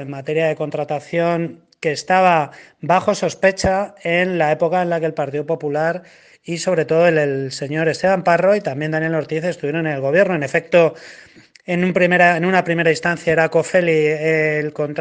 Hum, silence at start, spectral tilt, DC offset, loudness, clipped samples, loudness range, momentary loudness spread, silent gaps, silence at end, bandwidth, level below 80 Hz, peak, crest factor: none; 0 s; -5.5 dB/octave; under 0.1%; -18 LUFS; under 0.1%; 3 LU; 9 LU; none; 0 s; 9.6 kHz; -52 dBFS; 0 dBFS; 18 dB